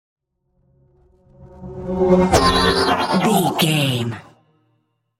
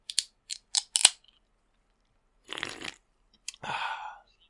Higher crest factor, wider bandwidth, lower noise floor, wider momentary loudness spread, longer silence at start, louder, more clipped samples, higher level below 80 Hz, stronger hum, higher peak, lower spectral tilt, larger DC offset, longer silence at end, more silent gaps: second, 18 dB vs 34 dB; first, 16 kHz vs 12 kHz; second, -67 dBFS vs -71 dBFS; about the same, 19 LU vs 20 LU; first, 1.4 s vs 0.1 s; first, -17 LUFS vs -27 LUFS; neither; first, -38 dBFS vs -70 dBFS; neither; about the same, -2 dBFS vs 0 dBFS; first, -5 dB/octave vs 2 dB/octave; neither; first, 1 s vs 0.3 s; neither